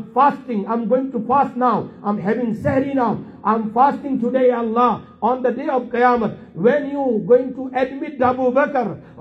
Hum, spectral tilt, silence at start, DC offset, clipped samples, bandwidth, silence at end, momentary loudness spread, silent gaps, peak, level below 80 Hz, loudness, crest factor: none; -8.5 dB/octave; 0 s; under 0.1%; under 0.1%; 6 kHz; 0 s; 6 LU; none; -2 dBFS; -58 dBFS; -19 LUFS; 16 dB